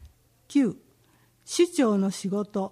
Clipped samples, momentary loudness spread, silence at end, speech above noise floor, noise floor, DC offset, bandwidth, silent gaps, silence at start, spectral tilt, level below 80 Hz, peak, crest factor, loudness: under 0.1%; 8 LU; 0.05 s; 38 dB; -62 dBFS; under 0.1%; 14.5 kHz; none; 0 s; -5.5 dB/octave; -62 dBFS; -10 dBFS; 16 dB; -26 LUFS